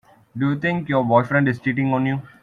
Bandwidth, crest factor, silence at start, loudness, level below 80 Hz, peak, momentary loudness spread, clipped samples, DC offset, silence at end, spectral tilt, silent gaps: 6.6 kHz; 18 dB; 0.35 s; -20 LUFS; -58 dBFS; -2 dBFS; 7 LU; under 0.1%; under 0.1%; 0.15 s; -9 dB/octave; none